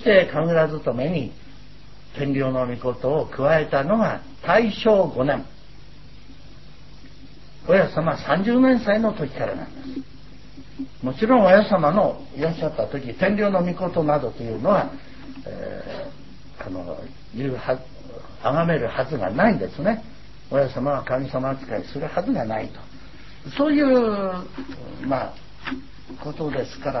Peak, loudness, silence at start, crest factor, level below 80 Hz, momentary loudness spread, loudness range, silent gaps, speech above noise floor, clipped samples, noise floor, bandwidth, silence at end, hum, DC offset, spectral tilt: -2 dBFS; -22 LUFS; 0 s; 22 dB; -48 dBFS; 19 LU; 6 LU; none; 24 dB; under 0.1%; -46 dBFS; 6 kHz; 0 s; none; 1%; -8 dB/octave